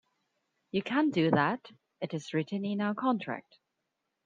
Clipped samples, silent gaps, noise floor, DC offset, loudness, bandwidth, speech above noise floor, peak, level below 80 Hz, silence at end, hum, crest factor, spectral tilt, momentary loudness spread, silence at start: under 0.1%; none; -83 dBFS; under 0.1%; -31 LUFS; 9 kHz; 53 dB; -12 dBFS; -74 dBFS; 0.85 s; none; 22 dB; -7 dB/octave; 13 LU; 0.75 s